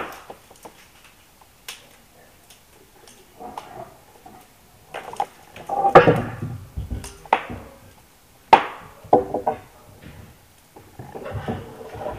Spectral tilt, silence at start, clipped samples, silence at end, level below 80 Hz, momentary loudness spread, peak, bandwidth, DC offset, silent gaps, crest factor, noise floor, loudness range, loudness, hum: -6 dB/octave; 0 s; under 0.1%; 0 s; -46 dBFS; 26 LU; 0 dBFS; 15.5 kHz; under 0.1%; none; 26 dB; -53 dBFS; 21 LU; -21 LUFS; none